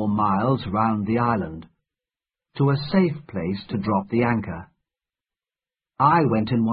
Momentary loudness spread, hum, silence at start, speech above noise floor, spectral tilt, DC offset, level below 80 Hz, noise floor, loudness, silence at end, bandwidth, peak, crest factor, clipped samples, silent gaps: 12 LU; none; 0 s; over 68 dB; -12 dB/octave; under 0.1%; -50 dBFS; under -90 dBFS; -22 LUFS; 0 s; 5.2 kHz; -4 dBFS; 18 dB; under 0.1%; none